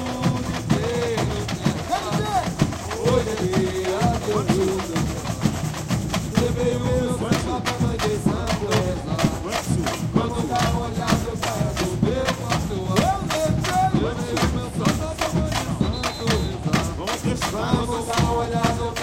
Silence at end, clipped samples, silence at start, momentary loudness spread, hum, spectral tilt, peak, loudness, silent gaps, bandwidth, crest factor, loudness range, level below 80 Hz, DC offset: 0 s; under 0.1%; 0 s; 3 LU; none; -5.5 dB/octave; -4 dBFS; -23 LUFS; none; 17 kHz; 18 dB; 1 LU; -36 dBFS; under 0.1%